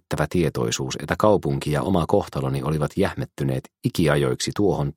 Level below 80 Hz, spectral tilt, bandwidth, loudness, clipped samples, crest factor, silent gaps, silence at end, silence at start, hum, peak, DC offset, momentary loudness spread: -44 dBFS; -6 dB/octave; 16.5 kHz; -23 LUFS; under 0.1%; 20 dB; none; 0.05 s; 0.1 s; none; -2 dBFS; under 0.1%; 7 LU